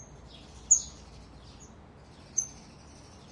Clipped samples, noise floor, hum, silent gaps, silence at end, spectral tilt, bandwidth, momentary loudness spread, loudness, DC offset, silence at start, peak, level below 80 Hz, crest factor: under 0.1%; -52 dBFS; none; none; 0 s; -1 dB/octave; 11.5 kHz; 27 LU; -27 LUFS; under 0.1%; 0 s; -8 dBFS; -56 dBFS; 26 dB